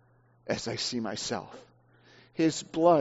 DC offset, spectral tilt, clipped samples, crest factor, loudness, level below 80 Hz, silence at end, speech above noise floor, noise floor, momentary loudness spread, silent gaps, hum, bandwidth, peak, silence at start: under 0.1%; -4 dB/octave; under 0.1%; 20 dB; -30 LUFS; -66 dBFS; 0 s; 32 dB; -60 dBFS; 17 LU; none; none; 8 kHz; -10 dBFS; 0.45 s